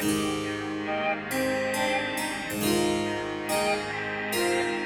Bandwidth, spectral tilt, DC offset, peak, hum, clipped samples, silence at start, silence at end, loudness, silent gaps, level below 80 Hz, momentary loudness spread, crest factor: over 20 kHz; -3.5 dB/octave; under 0.1%; -12 dBFS; none; under 0.1%; 0 s; 0 s; -27 LUFS; none; -56 dBFS; 5 LU; 16 dB